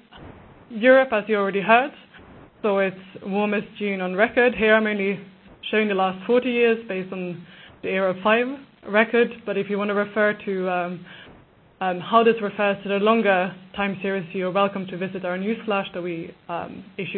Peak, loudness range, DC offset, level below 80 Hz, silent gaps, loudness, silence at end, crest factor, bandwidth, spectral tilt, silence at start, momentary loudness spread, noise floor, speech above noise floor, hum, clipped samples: -2 dBFS; 3 LU; under 0.1%; -60 dBFS; none; -22 LUFS; 0 s; 22 dB; 4.4 kHz; -10.5 dB/octave; 0.15 s; 14 LU; -51 dBFS; 29 dB; none; under 0.1%